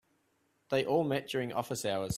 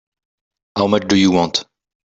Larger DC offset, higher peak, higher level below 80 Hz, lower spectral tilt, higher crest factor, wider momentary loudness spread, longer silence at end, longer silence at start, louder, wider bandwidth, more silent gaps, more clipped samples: neither; second, -16 dBFS vs -2 dBFS; second, -68 dBFS vs -52 dBFS; about the same, -5 dB/octave vs -5 dB/octave; about the same, 18 dB vs 18 dB; second, 5 LU vs 9 LU; second, 0 s vs 0.55 s; about the same, 0.7 s vs 0.75 s; second, -33 LUFS vs -16 LUFS; first, 16 kHz vs 8 kHz; neither; neither